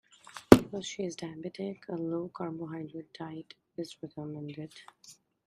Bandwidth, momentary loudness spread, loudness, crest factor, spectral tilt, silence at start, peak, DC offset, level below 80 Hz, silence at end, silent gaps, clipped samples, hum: 15.5 kHz; 25 LU; -30 LUFS; 32 dB; -6 dB/octave; 0.35 s; 0 dBFS; under 0.1%; -56 dBFS; 0.35 s; none; under 0.1%; none